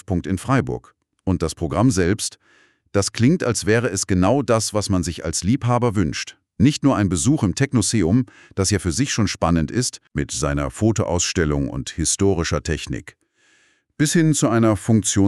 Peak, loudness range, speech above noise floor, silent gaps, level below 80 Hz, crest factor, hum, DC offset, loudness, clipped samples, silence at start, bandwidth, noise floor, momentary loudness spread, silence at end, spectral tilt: -4 dBFS; 2 LU; 40 dB; none; -38 dBFS; 16 dB; none; under 0.1%; -20 LUFS; under 0.1%; 0.1 s; 13.5 kHz; -60 dBFS; 8 LU; 0 s; -5 dB/octave